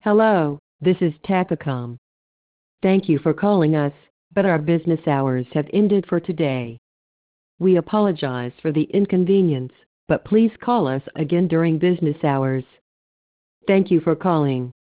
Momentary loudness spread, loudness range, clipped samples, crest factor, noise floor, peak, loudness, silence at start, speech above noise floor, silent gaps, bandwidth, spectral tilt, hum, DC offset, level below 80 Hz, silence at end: 8 LU; 2 LU; under 0.1%; 14 dB; under -90 dBFS; -6 dBFS; -20 LUFS; 0.05 s; over 71 dB; 0.59-0.79 s, 1.98-2.78 s, 4.10-4.31 s, 6.78-7.58 s, 9.86-10.07 s, 12.81-13.61 s; 4 kHz; -12 dB/octave; none; under 0.1%; -58 dBFS; 0.25 s